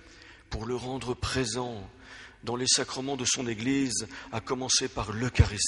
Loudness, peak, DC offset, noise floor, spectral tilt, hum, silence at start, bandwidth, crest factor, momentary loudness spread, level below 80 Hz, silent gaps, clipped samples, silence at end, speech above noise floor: -29 LUFS; -8 dBFS; under 0.1%; -52 dBFS; -3.5 dB/octave; none; 0.05 s; 11.5 kHz; 22 dB; 16 LU; -42 dBFS; none; under 0.1%; 0 s; 22 dB